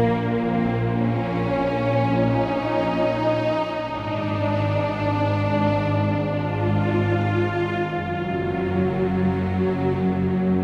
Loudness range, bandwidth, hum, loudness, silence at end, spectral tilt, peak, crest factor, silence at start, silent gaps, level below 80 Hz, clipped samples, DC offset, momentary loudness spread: 1 LU; 7 kHz; none; -23 LUFS; 0 s; -9 dB/octave; -10 dBFS; 12 dB; 0 s; none; -46 dBFS; under 0.1%; under 0.1%; 4 LU